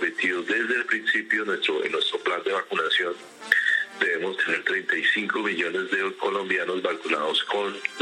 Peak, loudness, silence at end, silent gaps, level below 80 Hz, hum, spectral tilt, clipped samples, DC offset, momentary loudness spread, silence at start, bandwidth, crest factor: -2 dBFS; -24 LUFS; 0 s; none; -82 dBFS; none; -2.5 dB/octave; under 0.1%; under 0.1%; 5 LU; 0 s; 16 kHz; 24 dB